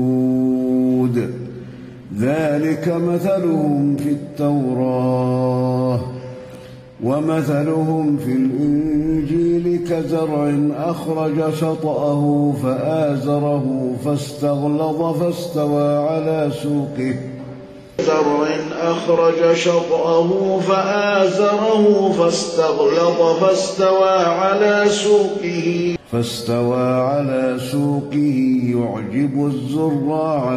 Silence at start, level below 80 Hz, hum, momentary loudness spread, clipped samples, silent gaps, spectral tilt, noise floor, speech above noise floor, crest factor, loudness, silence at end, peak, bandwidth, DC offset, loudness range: 0 s; -50 dBFS; none; 7 LU; under 0.1%; none; -6.5 dB/octave; -37 dBFS; 20 dB; 14 dB; -18 LUFS; 0 s; -2 dBFS; 14.5 kHz; under 0.1%; 5 LU